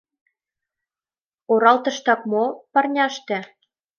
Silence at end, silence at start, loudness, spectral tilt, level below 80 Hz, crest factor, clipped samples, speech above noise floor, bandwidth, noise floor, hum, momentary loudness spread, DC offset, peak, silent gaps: 0.55 s; 1.5 s; -20 LUFS; -4 dB/octave; -80 dBFS; 20 dB; under 0.1%; over 70 dB; 7 kHz; under -90 dBFS; none; 11 LU; under 0.1%; -2 dBFS; none